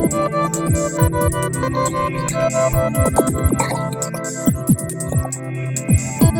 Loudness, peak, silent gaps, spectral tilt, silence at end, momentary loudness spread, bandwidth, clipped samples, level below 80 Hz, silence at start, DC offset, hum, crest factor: -19 LUFS; -2 dBFS; none; -6 dB/octave; 0 s; 6 LU; 19.5 kHz; under 0.1%; -32 dBFS; 0 s; under 0.1%; none; 16 dB